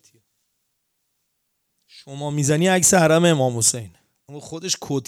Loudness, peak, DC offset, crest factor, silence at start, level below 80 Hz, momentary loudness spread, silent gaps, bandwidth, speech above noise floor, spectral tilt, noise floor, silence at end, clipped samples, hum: -18 LUFS; -2 dBFS; under 0.1%; 20 dB; 1.95 s; -58 dBFS; 19 LU; none; over 20 kHz; 54 dB; -4 dB/octave; -73 dBFS; 0.05 s; under 0.1%; none